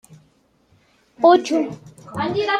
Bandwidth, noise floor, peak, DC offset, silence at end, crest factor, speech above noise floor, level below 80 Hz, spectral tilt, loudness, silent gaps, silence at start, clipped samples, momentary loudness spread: 11.5 kHz; -60 dBFS; -2 dBFS; under 0.1%; 0 s; 20 dB; 42 dB; -64 dBFS; -5 dB/octave; -18 LUFS; none; 0.1 s; under 0.1%; 18 LU